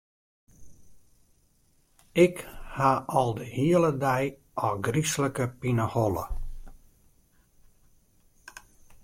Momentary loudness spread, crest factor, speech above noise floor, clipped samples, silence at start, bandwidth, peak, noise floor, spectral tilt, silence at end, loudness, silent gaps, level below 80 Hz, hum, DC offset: 18 LU; 20 dB; 39 dB; under 0.1%; 0.6 s; 16.5 kHz; -8 dBFS; -65 dBFS; -6 dB/octave; 0.1 s; -27 LUFS; none; -46 dBFS; none; under 0.1%